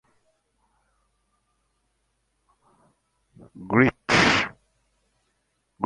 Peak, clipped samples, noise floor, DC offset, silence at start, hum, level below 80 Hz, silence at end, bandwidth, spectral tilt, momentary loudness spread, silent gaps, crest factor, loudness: -4 dBFS; under 0.1%; -73 dBFS; under 0.1%; 3.55 s; none; -54 dBFS; 0 s; 11 kHz; -4.5 dB/octave; 7 LU; none; 24 dB; -21 LUFS